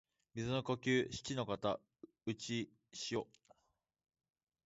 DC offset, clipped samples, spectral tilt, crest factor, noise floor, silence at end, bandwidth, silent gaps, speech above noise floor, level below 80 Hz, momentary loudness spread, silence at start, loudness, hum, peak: under 0.1%; under 0.1%; -4.5 dB/octave; 20 dB; -83 dBFS; 1.45 s; 8 kHz; none; 43 dB; -70 dBFS; 12 LU; 0.35 s; -41 LUFS; none; -22 dBFS